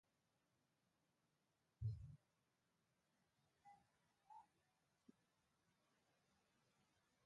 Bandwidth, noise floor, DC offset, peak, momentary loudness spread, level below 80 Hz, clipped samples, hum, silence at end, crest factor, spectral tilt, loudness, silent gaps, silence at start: 7 kHz; -88 dBFS; under 0.1%; -38 dBFS; 16 LU; -74 dBFS; under 0.1%; none; 2.15 s; 24 dB; -8 dB/octave; -54 LUFS; none; 1.8 s